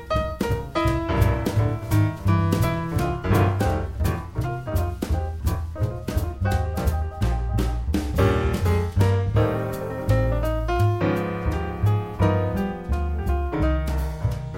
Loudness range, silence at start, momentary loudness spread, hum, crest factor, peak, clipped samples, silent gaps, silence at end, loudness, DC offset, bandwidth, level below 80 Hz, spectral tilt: 4 LU; 0 s; 6 LU; none; 16 dB; -6 dBFS; under 0.1%; none; 0 s; -24 LUFS; 0.3%; 16.5 kHz; -28 dBFS; -7.5 dB/octave